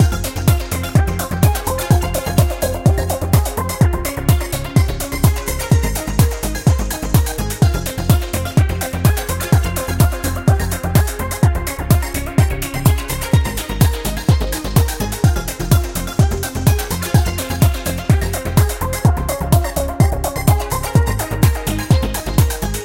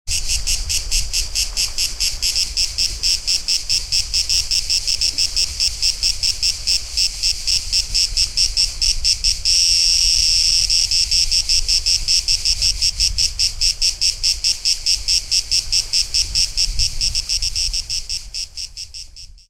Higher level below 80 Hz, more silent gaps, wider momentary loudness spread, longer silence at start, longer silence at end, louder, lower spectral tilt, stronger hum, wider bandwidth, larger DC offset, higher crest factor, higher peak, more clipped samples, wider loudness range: first, -22 dBFS vs -30 dBFS; neither; second, 3 LU vs 6 LU; about the same, 0 s vs 0.05 s; second, 0 s vs 0.15 s; about the same, -17 LUFS vs -16 LUFS; first, -5.5 dB/octave vs 1.5 dB/octave; neither; about the same, 17 kHz vs 17 kHz; neither; about the same, 16 dB vs 18 dB; about the same, 0 dBFS vs 0 dBFS; neither; second, 1 LU vs 4 LU